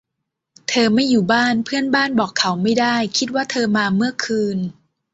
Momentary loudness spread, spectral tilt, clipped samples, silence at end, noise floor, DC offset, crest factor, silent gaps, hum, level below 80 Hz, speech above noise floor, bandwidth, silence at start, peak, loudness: 6 LU; -4 dB/octave; under 0.1%; 0.4 s; -79 dBFS; under 0.1%; 16 dB; none; none; -60 dBFS; 61 dB; 8 kHz; 0.7 s; -2 dBFS; -18 LUFS